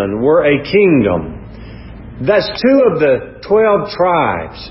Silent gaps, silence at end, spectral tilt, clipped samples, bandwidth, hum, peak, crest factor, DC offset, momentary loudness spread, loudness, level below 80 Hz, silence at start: none; 0 s; -10.5 dB/octave; under 0.1%; 5.8 kHz; none; 0 dBFS; 12 dB; under 0.1%; 22 LU; -13 LUFS; -38 dBFS; 0 s